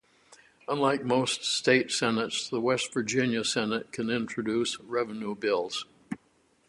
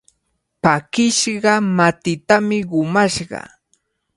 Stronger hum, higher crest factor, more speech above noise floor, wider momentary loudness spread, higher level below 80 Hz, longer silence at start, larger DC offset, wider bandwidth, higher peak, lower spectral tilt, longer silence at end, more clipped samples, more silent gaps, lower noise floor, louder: neither; about the same, 22 dB vs 18 dB; second, 38 dB vs 54 dB; first, 11 LU vs 8 LU; second, -68 dBFS vs -54 dBFS; second, 0.3 s vs 0.65 s; neither; about the same, 11.5 kHz vs 11.5 kHz; second, -8 dBFS vs 0 dBFS; about the same, -3.5 dB/octave vs -4 dB/octave; second, 0.55 s vs 0.75 s; neither; neither; second, -67 dBFS vs -71 dBFS; second, -28 LUFS vs -17 LUFS